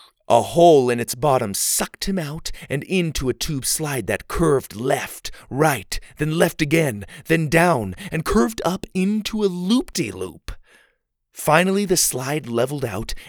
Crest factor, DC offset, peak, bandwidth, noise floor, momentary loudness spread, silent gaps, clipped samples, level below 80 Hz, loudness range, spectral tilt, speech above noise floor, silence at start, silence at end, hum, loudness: 20 dB; under 0.1%; 0 dBFS; over 20 kHz; -67 dBFS; 11 LU; none; under 0.1%; -40 dBFS; 3 LU; -4.5 dB/octave; 46 dB; 0.3 s; 0 s; none; -20 LUFS